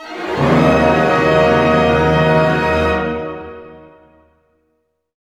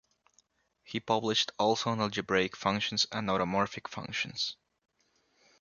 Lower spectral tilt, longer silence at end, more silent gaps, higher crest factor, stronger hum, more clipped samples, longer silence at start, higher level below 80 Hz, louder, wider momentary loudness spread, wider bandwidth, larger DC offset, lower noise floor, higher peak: first, -7 dB/octave vs -3.5 dB/octave; first, 1.45 s vs 1.1 s; neither; second, 16 dB vs 22 dB; neither; neither; second, 0 s vs 0.9 s; first, -34 dBFS vs -64 dBFS; first, -13 LUFS vs -31 LUFS; first, 12 LU vs 9 LU; first, 12 kHz vs 7.4 kHz; neither; second, -66 dBFS vs -73 dBFS; first, 0 dBFS vs -12 dBFS